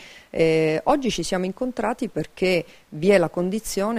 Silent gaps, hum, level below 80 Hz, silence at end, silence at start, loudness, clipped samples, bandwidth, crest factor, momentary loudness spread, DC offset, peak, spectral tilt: none; none; -48 dBFS; 0 s; 0 s; -23 LUFS; under 0.1%; 15.5 kHz; 18 dB; 8 LU; under 0.1%; -4 dBFS; -5 dB/octave